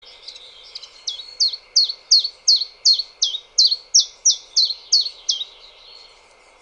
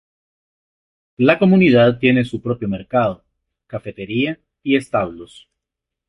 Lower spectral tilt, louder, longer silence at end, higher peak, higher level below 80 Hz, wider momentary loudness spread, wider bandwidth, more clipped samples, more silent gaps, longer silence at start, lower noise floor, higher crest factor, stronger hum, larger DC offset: second, 5.5 dB/octave vs -8 dB/octave; about the same, -16 LUFS vs -17 LUFS; first, 1.2 s vs 0.85 s; about the same, -4 dBFS vs -2 dBFS; second, -64 dBFS vs -52 dBFS; first, 21 LU vs 18 LU; first, 18.5 kHz vs 11.5 kHz; neither; neither; second, 0.25 s vs 1.2 s; second, -50 dBFS vs -83 dBFS; about the same, 18 dB vs 16 dB; neither; neither